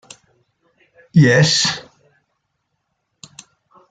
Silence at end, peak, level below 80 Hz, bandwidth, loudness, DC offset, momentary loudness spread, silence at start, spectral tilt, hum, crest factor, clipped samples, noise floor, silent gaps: 2.1 s; -2 dBFS; -56 dBFS; 9.2 kHz; -14 LUFS; under 0.1%; 9 LU; 1.15 s; -4.5 dB/octave; none; 18 dB; under 0.1%; -72 dBFS; none